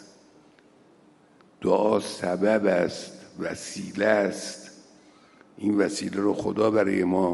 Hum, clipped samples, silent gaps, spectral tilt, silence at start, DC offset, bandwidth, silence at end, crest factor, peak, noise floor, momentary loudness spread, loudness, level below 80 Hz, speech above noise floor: none; under 0.1%; none; -5.5 dB/octave; 0 s; under 0.1%; 11.5 kHz; 0 s; 20 dB; -8 dBFS; -57 dBFS; 13 LU; -25 LUFS; -68 dBFS; 33 dB